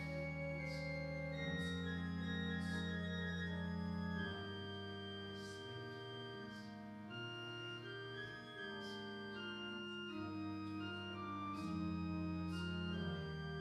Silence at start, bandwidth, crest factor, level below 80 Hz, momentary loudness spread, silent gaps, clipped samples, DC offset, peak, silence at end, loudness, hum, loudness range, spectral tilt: 0 s; 12 kHz; 14 dB; -68 dBFS; 7 LU; none; under 0.1%; under 0.1%; -30 dBFS; 0 s; -45 LUFS; none; 6 LU; -6.5 dB/octave